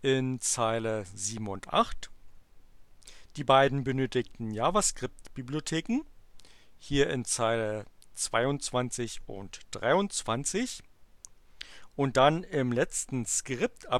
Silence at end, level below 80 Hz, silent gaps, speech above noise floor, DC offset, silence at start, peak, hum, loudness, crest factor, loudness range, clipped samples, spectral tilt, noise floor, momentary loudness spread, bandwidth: 0 s; -50 dBFS; none; 25 dB; 0.2%; 0.05 s; -8 dBFS; none; -29 LUFS; 22 dB; 3 LU; under 0.1%; -4 dB/octave; -54 dBFS; 18 LU; 15 kHz